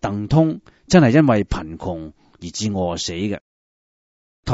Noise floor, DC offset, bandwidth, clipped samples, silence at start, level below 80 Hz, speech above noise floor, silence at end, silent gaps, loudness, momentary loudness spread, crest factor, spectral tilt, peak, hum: under -90 dBFS; under 0.1%; 8 kHz; under 0.1%; 0 s; -38 dBFS; over 72 dB; 0 s; 3.41-4.43 s; -19 LUFS; 19 LU; 20 dB; -6 dB/octave; 0 dBFS; none